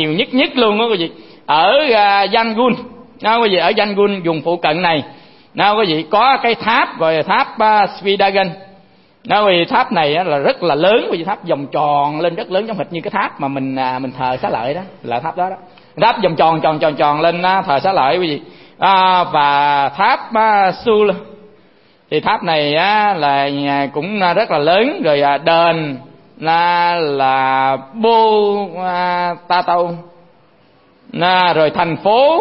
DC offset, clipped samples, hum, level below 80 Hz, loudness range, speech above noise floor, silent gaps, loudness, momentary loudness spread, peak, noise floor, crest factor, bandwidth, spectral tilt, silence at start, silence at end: 0.2%; under 0.1%; none; -56 dBFS; 4 LU; 36 dB; none; -14 LUFS; 9 LU; 0 dBFS; -50 dBFS; 14 dB; 5.8 kHz; -9 dB/octave; 0 s; 0 s